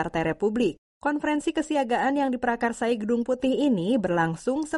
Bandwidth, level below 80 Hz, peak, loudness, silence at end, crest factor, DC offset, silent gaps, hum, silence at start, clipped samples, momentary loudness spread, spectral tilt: 11.5 kHz; -54 dBFS; -12 dBFS; -25 LUFS; 0 s; 14 dB; under 0.1%; 0.78-1.01 s; none; 0 s; under 0.1%; 4 LU; -6 dB/octave